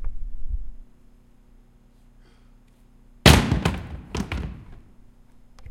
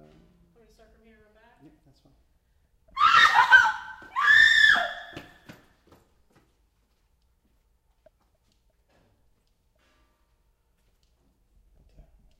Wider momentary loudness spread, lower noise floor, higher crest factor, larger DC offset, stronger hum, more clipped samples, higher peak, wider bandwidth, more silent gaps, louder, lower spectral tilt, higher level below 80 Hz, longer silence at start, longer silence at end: about the same, 23 LU vs 23 LU; second, -53 dBFS vs -69 dBFS; about the same, 26 dB vs 24 dB; neither; first, 60 Hz at -45 dBFS vs none; neither; first, 0 dBFS vs -4 dBFS; about the same, 16.5 kHz vs 15.5 kHz; neither; second, -21 LUFS vs -18 LUFS; first, -4.5 dB/octave vs 0 dB/octave; first, -32 dBFS vs -60 dBFS; second, 0 s vs 2.95 s; second, 0.05 s vs 7.2 s